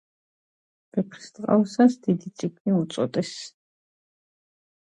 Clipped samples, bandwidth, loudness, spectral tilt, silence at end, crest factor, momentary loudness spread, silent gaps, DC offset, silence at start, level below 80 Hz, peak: under 0.1%; 9.6 kHz; -25 LUFS; -7 dB/octave; 1.4 s; 20 dB; 14 LU; 2.60-2.65 s; under 0.1%; 0.95 s; -72 dBFS; -6 dBFS